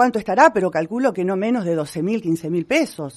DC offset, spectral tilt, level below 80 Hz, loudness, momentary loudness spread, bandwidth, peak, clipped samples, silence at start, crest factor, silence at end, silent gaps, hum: under 0.1%; -6 dB/octave; -60 dBFS; -19 LUFS; 8 LU; 13 kHz; 0 dBFS; under 0.1%; 0 s; 18 dB; 0.05 s; none; none